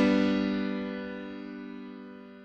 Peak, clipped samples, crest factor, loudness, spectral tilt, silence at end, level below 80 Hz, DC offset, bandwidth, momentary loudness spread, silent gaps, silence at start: -14 dBFS; under 0.1%; 18 dB; -31 LUFS; -7 dB/octave; 0 s; -58 dBFS; under 0.1%; 8.2 kHz; 18 LU; none; 0 s